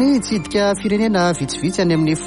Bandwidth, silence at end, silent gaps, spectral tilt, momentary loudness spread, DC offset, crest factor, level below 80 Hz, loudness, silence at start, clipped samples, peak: 11.5 kHz; 0 s; none; -5.5 dB/octave; 4 LU; under 0.1%; 12 dB; -44 dBFS; -18 LUFS; 0 s; under 0.1%; -6 dBFS